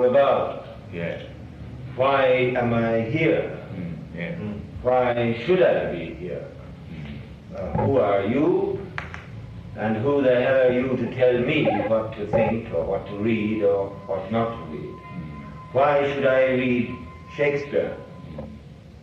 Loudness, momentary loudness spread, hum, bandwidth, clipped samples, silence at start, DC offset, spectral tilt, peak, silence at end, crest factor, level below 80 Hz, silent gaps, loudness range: -23 LUFS; 18 LU; none; 6.8 kHz; under 0.1%; 0 s; under 0.1%; -8 dB/octave; -8 dBFS; 0 s; 16 dB; -48 dBFS; none; 4 LU